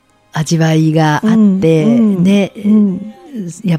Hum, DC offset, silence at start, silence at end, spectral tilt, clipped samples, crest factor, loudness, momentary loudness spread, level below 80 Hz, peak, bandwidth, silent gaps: none; under 0.1%; 0.35 s; 0 s; -7 dB/octave; under 0.1%; 10 dB; -11 LUFS; 14 LU; -50 dBFS; 0 dBFS; 12.5 kHz; none